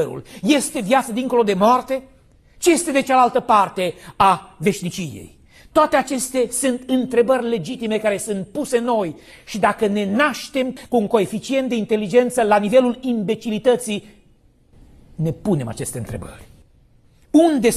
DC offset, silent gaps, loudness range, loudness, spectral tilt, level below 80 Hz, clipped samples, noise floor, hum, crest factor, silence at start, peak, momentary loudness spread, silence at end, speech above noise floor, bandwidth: under 0.1%; none; 6 LU; -19 LUFS; -4.5 dB/octave; -50 dBFS; under 0.1%; -54 dBFS; none; 18 dB; 0 s; -2 dBFS; 11 LU; 0 s; 36 dB; 14 kHz